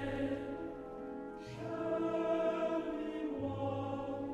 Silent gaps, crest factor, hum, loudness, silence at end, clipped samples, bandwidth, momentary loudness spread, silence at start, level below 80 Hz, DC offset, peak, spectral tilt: none; 14 dB; none; -39 LUFS; 0 s; under 0.1%; 10 kHz; 11 LU; 0 s; -60 dBFS; under 0.1%; -24 dBFS; -7.5 dB/octave